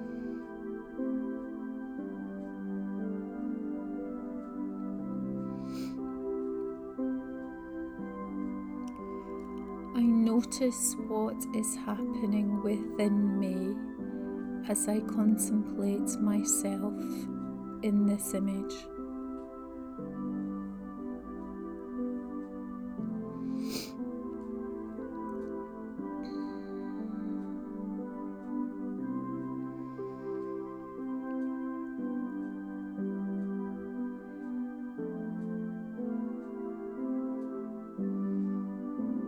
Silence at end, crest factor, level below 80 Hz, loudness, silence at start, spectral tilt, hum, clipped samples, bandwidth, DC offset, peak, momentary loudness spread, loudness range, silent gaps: 0 s; 18 dB; -62 dBFS; -35 LUFS; 0 s; -5.5 dB/octave; none; under 0.1%; 19.5 kHz; under 0.1%; -16 dBFS; 12 LU; 8 LU; none